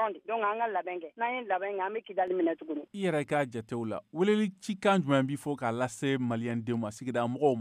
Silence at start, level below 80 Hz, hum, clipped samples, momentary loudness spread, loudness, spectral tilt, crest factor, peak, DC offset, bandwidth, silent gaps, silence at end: 0 s; -76 dBFS; none; under 0.1%; 7 LU; -31 LUFS; -6.5 dB/octave; 16 dB; -14 dBFS; under 0.1%; 15 kHz; none; 0 s